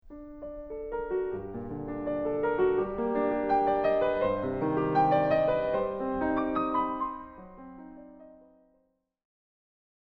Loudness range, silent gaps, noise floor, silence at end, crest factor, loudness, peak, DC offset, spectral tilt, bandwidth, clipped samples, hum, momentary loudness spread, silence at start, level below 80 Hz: 8 LU; none; -73 dBFS; 1.7 s; 16 dB; -29 LUFS; -14 dBFS; under 0.1%; -9 dB/octave; 5.8 kHz; under 0.1%; none; 21 LU; 0.05 s; -52 dBFS